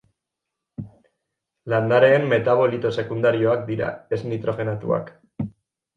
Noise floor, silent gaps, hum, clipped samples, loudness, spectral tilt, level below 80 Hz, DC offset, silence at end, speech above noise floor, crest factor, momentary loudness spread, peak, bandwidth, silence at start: -83 dBFS; none; none; under 0.1%; -21 LUFS; -8 dB/octave; -58 dBFS; under 0.1%; 0.45 s; 63 dB; 18 dB; 22 LU; -4 dBFS; 7.6 kHz; 0.8 s